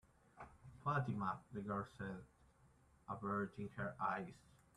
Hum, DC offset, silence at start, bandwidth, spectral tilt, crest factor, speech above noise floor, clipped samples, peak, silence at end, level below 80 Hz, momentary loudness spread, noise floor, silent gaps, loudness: none; under 0.1%; 0.35 s; 11.5 kHz; -8 dB/octave; 20 dB; 27 dB; under 0.1%; -26 dBFS; 0.35 s; -72 dBFS; 18 LU; -71 dBFS; none; -45 LUFS